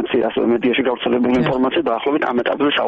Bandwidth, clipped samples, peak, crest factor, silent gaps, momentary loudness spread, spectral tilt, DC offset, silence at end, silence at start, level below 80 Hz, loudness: 7 kHz; under 0.1%; -8 dBFS; 10 dB; none; 2 LU; -3.5 dB/octave; under 0.1%; 0 s; 0 s; -50 dBFS; -18 LUFS